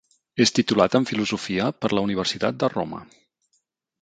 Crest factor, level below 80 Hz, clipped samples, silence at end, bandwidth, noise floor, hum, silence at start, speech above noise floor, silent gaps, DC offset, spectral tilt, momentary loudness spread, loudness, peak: 22 dB; -58 dBFS; under 0.1%; 1 s; 9.4 kHz; -72 dBFS; none; 0.35 s; 49 dB; none; under 0.1%; -4.5 dB/octave; 11 LU; -23 LUFS; -2 dBFS